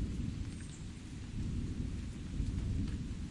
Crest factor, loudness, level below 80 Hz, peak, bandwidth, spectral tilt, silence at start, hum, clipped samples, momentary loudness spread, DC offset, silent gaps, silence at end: 16 dB; -41 LUFS; -44 dBFS; -24 dBFS; 11.5 kHz; -6.5 dB/octave; 0 s; none; under 0.1%; 8 LU; under 0.1%; none; 0 s